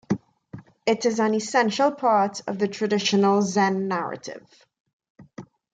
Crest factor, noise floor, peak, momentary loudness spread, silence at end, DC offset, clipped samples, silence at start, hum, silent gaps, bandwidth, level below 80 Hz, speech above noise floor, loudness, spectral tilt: 16 dB; -45 dBFS; -8 dBFS; 10 LU; 0.3 s; under 0.1%; under 0.1%; 0.1 s; none; 4.80-4.85 s, 4.93-5.00 s, 5.10-5.15 s; 9.2 kHz; -68 dBFS; 22 dB; -23 LUFS; -4.5 dB/octave